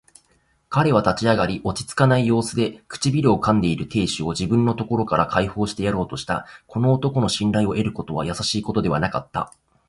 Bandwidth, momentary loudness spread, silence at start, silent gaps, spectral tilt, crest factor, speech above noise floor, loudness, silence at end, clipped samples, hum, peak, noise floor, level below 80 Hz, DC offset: 11.5 kHz; 8 LU; 0.7 s; none; -6 dB/octave; 18 dB; 42 dB; -21 LUFS; 0.4 s; under 0.1%; none; -2 dBFS; -63 dBFS; -44 dBFS; under 0.1%